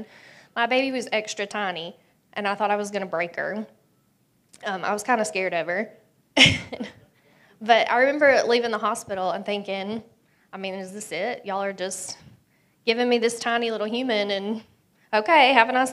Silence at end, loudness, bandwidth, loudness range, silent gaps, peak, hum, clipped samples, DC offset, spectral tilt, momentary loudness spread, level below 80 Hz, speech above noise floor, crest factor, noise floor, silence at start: 0 s; -23 LUFS; 14 kHz; 9 LU; none; 0 dBFS; none; under 0.1%; under 0.1%; -3 dB/octave; 18 LU; -60 dBFS; 42 dB; 24 dB; -65 dBFS; 0 s